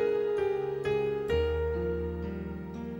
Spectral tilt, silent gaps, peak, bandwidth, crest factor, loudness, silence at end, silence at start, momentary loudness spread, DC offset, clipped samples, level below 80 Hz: -8 dB/octave; none; -16 dBFS; 16 kHz; 14 dB; -31 LUFS; 0 s; 0 s; 9 LU; under 0.1%; under 0.1%; -42 dBFS